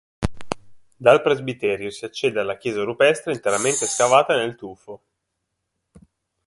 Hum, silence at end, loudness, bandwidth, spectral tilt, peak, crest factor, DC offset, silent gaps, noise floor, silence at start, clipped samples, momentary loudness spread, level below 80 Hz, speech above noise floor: none; 1.5 s; -20 LUFS; 11.5 kHz; -3.5 dB/octave; 0 dBFS; 22 dB; under 0.1%; none; -78 dBFS; 0.2 s; under 0.1%; 17 LU; -46 dBFS; 57 dB